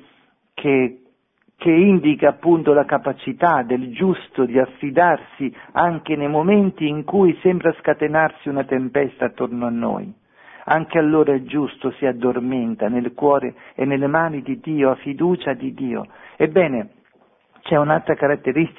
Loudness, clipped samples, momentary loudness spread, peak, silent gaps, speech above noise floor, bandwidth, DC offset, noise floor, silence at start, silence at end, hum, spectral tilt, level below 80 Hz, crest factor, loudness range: -19 LUFS; under 0.1%; 10 LU; -2 dBFS; none; 44 dB; 3.9 kHz; under 0.1%; -62 dBFS; 0.6 s; 0.1 s; none; -11 dB/octave; -58 dBFS; 18 dB; 4 LU